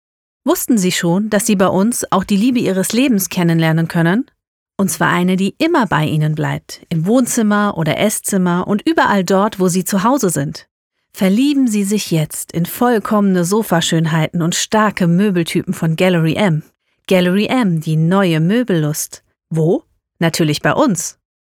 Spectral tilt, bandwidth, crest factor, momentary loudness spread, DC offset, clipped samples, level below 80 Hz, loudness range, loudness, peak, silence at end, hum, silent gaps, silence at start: -5 dB/octave; 18.5 kHz; 14 dB; 7 LU; under 0.1%; under 0.1%; -52 dBFS; 2 LU; -15 LUFS; -2 dBFS; 0.3 s; none; 4.47-4.66 s, 10.71-10.90 s; 0.45 s